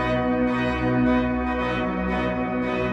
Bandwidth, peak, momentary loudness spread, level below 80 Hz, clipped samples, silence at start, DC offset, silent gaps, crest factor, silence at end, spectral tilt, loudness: 7.8 kHz; -10 dBFS; 4 LU; -36 dBFS; under 0.1%; 0 s; under 0.1%; none; 14 dB; 0 s; -8 dB/octave; -23 LUFS